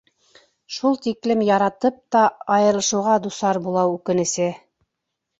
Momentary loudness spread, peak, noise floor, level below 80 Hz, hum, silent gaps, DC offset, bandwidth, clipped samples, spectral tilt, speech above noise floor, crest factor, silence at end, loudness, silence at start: 6 LU; -4 dBFS; -80 dBFS; -64 dBFS; none; none; under 0.1%; 8.2 kHz; under 0.1%; -4.5 dB/octave; 60 dB; 16 dB; 0.8 s; -20 LUFS; 0.7 s